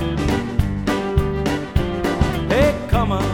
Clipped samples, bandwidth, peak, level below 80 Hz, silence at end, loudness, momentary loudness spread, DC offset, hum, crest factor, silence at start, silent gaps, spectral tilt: under 0.1%; 19 kHz; -2 dBFS; -26 dBFS; 0 s; -20 LUFS; 5 LU; under 0.1%; none; 16 dB; 0 s; none; -6.5 dB/octave